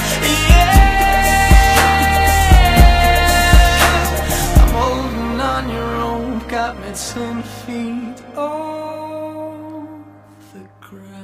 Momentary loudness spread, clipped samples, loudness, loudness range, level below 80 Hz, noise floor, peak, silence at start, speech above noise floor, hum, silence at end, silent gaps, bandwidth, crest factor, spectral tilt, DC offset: 17 LU; under 0.1%; -14 LUFS; 15 LU; -18 dBFS; -42 dBFS; 0 dBFS; 0 s; 18 dB; none; 0 s; none; 16 kHz; 14 dB; -4.5 dB/octave; under 0.1%